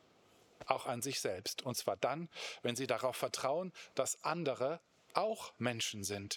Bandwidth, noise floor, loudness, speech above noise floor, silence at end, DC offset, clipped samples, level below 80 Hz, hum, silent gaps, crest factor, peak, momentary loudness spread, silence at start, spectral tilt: over 20 kHz; -67 dBFS; -38 LUFS; 29 dB; 0 s; under 0.1%; under 0.1%; -82 dBFS; none; none; 26 dB; -12 dBFS; 4 LU; 0.6 s; -3 dB/octave